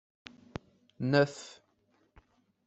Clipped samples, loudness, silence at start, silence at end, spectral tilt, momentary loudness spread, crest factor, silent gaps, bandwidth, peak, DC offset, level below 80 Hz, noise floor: under 0.1%; -30 LUFS; 1 s; 1.15 s; -6 dB/octave; 25 LU; 24 dB; none; 8.2 kHz; -12 dBFS; under 0.1%; -68 dBFS; -72 dBFS